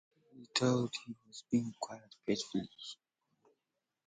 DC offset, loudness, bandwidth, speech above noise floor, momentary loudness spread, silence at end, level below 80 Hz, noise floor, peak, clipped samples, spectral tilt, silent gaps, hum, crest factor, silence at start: under 0.1%; -37 LUFS; 9.4 kHz; 51 dB; 17 LU; 1.1 s; -76 dBFS; -88 dBFS; -14 dBFS; under 0.1%; -5 dB/octave; none; none; 26 dB; 0.35 s